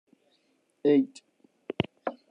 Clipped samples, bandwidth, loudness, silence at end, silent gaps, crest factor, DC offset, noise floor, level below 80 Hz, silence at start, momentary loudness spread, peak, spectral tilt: under 0.1%; 9.4 kHz; -28 LUFS; 0.2 s; none; 24 dB; under 0.1%; -71 dBFS; -70 dBFS; 0.85 s; 14 LU; -8 dBFS; -7 dB/octave